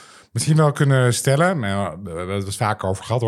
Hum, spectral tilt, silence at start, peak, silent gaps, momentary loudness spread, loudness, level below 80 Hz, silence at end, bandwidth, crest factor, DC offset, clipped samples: none; -5.5 dB/octave; 0.35 s; -4 dBFS; none; 10 LU; -20 LUFS; -58 dBFS; 0 s; 14 kHz; 16 dB; under 0.1%; under 0.1%